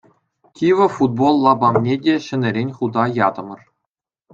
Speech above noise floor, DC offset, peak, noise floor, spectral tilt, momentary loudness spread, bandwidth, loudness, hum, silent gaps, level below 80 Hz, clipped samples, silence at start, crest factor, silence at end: 65 dB; under 0.1%; -2 dBFS; -81 dBFS; -7.5 dB/octave; 7 LU; 7.8 kHz; -17 LUFS; none; none; -62 dBFS; under 0.1%; 0.6 s; 16 dB; 0.8 s